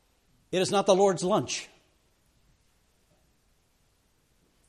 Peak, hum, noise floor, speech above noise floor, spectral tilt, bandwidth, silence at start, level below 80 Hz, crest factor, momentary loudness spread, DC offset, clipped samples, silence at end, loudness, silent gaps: -8 dBFS; none; -68 dBFS; 44 dB; -4.5 dB/octave; 13 kHz; 0.5 s; -68 dBFS; 22 dB; 12 LU; under 0.1%; under 0.1%; 3 s; -26 LUFS; none